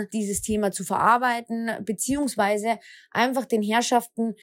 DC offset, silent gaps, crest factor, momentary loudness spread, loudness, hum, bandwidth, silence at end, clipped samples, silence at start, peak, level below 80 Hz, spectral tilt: under 0.1%; none; 18 dB; 9 LU; -24 LUFS; none; 16.5 kHz; 0.1 s; under 0.1%; 0 s; -6 dBFS; -54 dBFS; -3.5 dB/octave